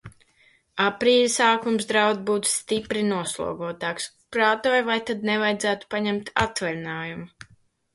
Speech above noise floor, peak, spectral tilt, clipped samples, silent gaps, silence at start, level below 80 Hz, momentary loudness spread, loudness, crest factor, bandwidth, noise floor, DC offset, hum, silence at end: 37 dB; -6 dBFS; -3 dB/octave; under 0.1%; none; 0.05 s; -56 dBFS; 11 LU; -23 LUFS; 20 dB; 11.5 kHz; -61 dBFS; under 0.1%; none; 0.65 s